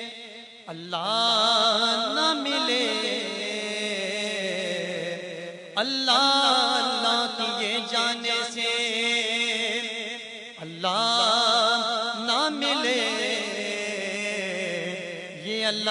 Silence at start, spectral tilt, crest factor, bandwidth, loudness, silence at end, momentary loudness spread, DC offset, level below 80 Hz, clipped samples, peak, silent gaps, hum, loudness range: 0 s; -2 dB/octave; 20 dB; 11 kHz; -24 LUFS; 0 s; 14 LU; under 0.1%; -78 dBFS; under 0.1%; -6 dBFS; none; none; 4 LU